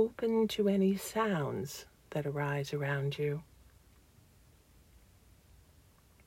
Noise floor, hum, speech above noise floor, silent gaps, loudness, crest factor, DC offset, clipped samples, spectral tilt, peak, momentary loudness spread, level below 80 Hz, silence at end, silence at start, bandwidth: -63 dBFS; none; 30 dB; none; -34 LUFS; 18 dB; under 0.1%; under 0.1%; -6 dB/octave; -18 dBFS; 11 LU; -64 dBFS; 2.85 s; 0 s; 16 kHz